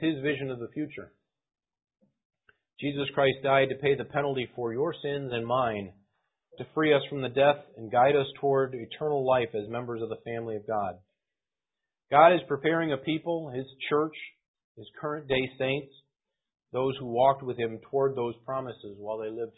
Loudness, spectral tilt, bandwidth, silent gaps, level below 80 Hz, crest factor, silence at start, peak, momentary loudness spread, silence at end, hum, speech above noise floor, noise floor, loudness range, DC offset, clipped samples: -28 LUFS; -10 dB/octave; 4 kHz; 2.25-2.30 s, 14.48-14.54 s, 14.64-14.75 s; -66 dBFS; 24 dB; 0 s; -6 dBFS; 12 LU; 0.1 s; none; over 62 dB; under -90 dBFS; 6 LU; under 0.1%; under 0.1%